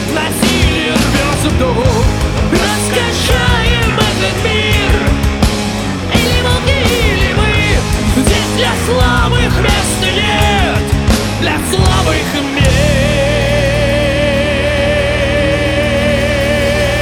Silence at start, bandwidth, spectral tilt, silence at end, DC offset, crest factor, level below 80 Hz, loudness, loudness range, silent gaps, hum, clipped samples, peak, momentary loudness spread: 0 s; 18.5 kHz; -4.5 dB/octave; 0 s; under 0.1%; 10 dB; -18 dBFS; -12 LUFS; 1 LU; none; none; under 0.1%; -2 dBFS; 2 LU